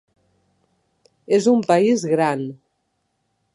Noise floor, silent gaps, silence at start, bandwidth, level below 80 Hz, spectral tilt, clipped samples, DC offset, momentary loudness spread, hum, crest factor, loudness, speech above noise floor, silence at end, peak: -72 dBFS; none; 1.3 s; 11.5 kHz; -72 dBFS; -6 dB/octave; under 0.1%; under 0.1%; 9 LU; none; 18 dB; -18 LUFS; 54 dB; 1 s; -4 dBFS